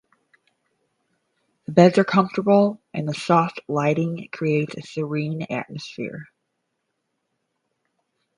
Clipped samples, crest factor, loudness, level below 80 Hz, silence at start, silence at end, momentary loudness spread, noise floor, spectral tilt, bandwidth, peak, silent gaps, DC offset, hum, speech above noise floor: under 0.1%; 22 dB; -21 LUFS; -68 dBFS; 1.7 s; 2.15 s; 16 LU; -76 dBFS; -7 dB/octave; 10.5 kHz; 0 dBFS; none; under 0.1%; none; 55 dB